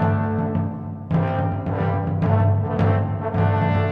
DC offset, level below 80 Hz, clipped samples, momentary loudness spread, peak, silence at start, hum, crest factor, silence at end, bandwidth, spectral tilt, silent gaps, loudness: 0.1%; -44 dBFS; under 0.1%; 5 LU; -6 dBFS; 0 s; none; 16 dB; 0 s; 4.4 kHz; -10.5 dB/octave; none; -22 LUFS